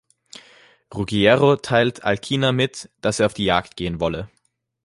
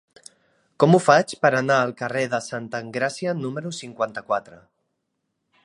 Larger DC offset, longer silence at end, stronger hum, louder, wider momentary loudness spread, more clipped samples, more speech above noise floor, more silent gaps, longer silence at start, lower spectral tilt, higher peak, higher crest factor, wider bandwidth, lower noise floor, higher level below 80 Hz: neither; second, 0.6 s vs 1.1 s; neither; about the same, -20 LUFS vs -22 LUFS; about the same, 13 LU vs 13 LU; neither; second, 32 dB vs 55 dB; neither; about the same, 0.9 s vs 0.8 s; about the same, -5 dB/octave vs -5.5 dB/octave; about the same, -2 dBFS vs -2 dBFS; about the same, 20 dB vs 22 dB; about the same, 11.5 kHz vs 11.5 kHz; second, -52 dBFS vs -77 dBFS; first, -46 dBFS vs -70 dBFS